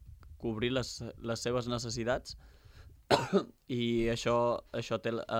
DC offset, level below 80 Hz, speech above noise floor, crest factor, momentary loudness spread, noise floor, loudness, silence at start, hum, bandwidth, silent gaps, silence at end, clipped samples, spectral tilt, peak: under 0.1%; -54 dBFS; 22 dB; 24 dB; 10 LU; -55 dBFS; -33 LUFS; 0 s; none; 16.5 kHz; none; 0 s; under 0.1%; -5 dB/octave; -10 dBFS